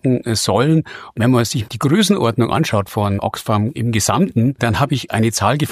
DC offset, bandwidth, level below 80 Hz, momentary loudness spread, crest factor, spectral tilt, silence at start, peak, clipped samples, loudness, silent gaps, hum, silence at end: under 0.1%; 15.5 kHz; -46 dBFS; 5 LU; 14 dB; -5.5 dB/octave; 0.05 s; -2 dBFS; under 0.1%; -17 LUFS; none; none; 0 s